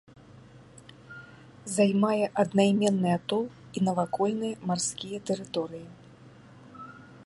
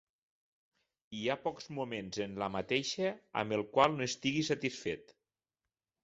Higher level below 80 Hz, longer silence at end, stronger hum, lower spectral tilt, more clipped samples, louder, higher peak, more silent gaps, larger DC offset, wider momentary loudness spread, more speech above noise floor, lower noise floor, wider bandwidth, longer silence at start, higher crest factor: about the same, -68 dBFS vs -70 dBFS; second, 0 s vs 0.95 s; neither; first, -5.5 dB/octave vs -3.5 dB/octave; neither; first, -28 LUFS vs -35 LUFS; about the same, -10 dBFS vs -12 dBFS; neither; neither; first, 23 LU vs 11 LU; second, 25 dB vs over 55 dB; second, -52 dBFS vs under -90 dBFS; first, 11.5 kHz vs 8 kHz; second, 0.55 s vs 1.1 s; about the same, 20 dB vs 24 dB